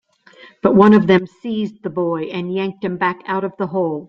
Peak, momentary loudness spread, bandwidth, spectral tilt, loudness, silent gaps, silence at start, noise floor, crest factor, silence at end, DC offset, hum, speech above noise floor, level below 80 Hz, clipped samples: -2 dBFS; 13 LU; 6 kHz; -8.5 dB/octave; -17 LUFS; none; 0.45 s; -46 dBFS; 16 dB; 0.05 s; under 0.1%; none; 29 dB; -56 dBFS; under 0.1%